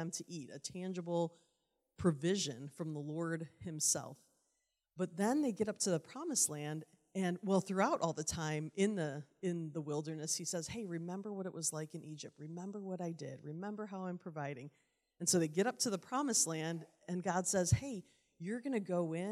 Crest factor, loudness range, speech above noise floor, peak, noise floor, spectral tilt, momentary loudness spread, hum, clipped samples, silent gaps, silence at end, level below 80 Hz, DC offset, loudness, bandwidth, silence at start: 20 dB; 7 LU; 46 dB; -18 dBFS; -85 dBFS; -4 dB/octave; 13 LU; none; under 0.1%; none; 0 s; -68 dBFS; under 0.1%; -38 LUFS; 15.5 kHz; 0 s